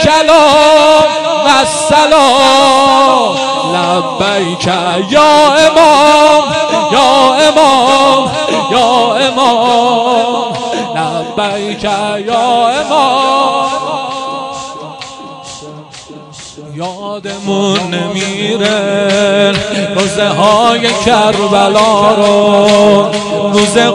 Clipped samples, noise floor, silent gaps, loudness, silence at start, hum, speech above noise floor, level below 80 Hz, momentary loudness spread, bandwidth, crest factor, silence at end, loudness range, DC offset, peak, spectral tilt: under 0.1%; -31 dBFS; none; -9 LUFS; 0 s; none; 23 dB; -44 dBFS; 15 LU; 12.5 kHz; 10 dB; 0 s; 11 LU; under 0.1%; 0 dBFS; -3.5 dB/octave